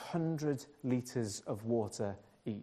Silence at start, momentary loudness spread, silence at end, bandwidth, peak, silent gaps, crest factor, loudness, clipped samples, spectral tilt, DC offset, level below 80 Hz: 0 s; 6 LU; 0 s; 14 kHz; -22 dBFS; none; 16 dB; -38 LUFS; under 0.1%; -6.5 dB/octave; under 0.1%; -74 dBFS